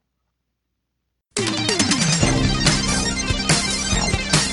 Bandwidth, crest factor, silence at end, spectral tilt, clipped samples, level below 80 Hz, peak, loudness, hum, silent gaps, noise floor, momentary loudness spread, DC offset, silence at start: 12 kHz; 20 dB; 0 s; -3 dB/octave; under 0.1%; -32 dBFS; -2 dBFS; -19 LUFS; none; none; -76 dBFS; 4 LU; under 0.1%; 1.35 s